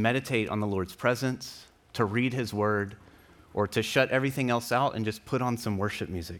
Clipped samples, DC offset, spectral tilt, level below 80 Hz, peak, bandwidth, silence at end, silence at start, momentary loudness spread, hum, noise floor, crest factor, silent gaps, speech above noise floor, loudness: under 0.1%; under 0.1%; -5.5 dB/octave; -60 dBFS; -10 dBFS; 19 kHz; 0 s; 0 s; 10 LU; none; -55 dBFS; 20 dB; none; 27 dB; -29 LUFS